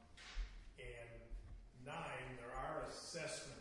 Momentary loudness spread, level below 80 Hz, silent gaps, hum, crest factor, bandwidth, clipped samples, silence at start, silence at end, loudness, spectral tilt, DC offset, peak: 11 LU; -56 dBFS; none; none; 16 dB; 11.5 kHz; under 0.1%; 0 s; 0 s; -50 LUFS; -3.5 dB/octave; under 0.1%; -34 dBFS